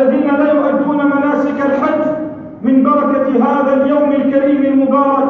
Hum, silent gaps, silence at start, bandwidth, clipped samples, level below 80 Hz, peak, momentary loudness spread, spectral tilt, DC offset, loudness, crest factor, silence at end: none; none; 0 s; 4.1 kHz; under 0.1%; -54 dBFS; 0 dBFS; 4 LU; -8.5 dB/octave; under 0.1%; -13 LUFS; 12 dB; 0 s